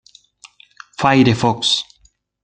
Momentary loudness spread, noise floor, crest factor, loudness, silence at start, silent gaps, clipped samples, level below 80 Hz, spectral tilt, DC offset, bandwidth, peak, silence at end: 19 LU; -57 dBFS; 18 dB; -15 LUFS; 1 s; none; under 0.1%; -50 dBFS; -4.5 dB/octave; under 0.1%; 9.4 kHz; -2 dBFS; 0.6 s